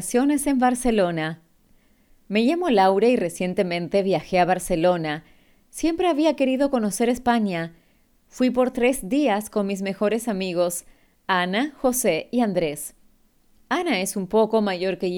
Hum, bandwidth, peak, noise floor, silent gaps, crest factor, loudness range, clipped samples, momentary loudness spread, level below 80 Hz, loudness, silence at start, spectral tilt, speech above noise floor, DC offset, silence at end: none; 19 kHz; -6 dBFS; -60 dBFS; none; 16 dB; 3 LU; under 0.1%; 8 LU; -50 dBFS; -22 LUFS; 0 s; -4.5 dB/octave; 39 dB; under 0.1%; 0 s